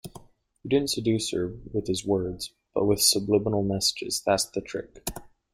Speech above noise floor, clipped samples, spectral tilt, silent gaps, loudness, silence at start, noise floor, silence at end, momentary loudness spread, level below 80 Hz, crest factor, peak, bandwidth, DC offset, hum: 25 dB; under 0.1%; -4 dB/octave; none; -26 LUFS; 0.05 s; -51 dBFS; 0.3 s; 16 LU; -52 dBFS; 20 dB; -6 dBFS; 16 kHz; under 0.1%; none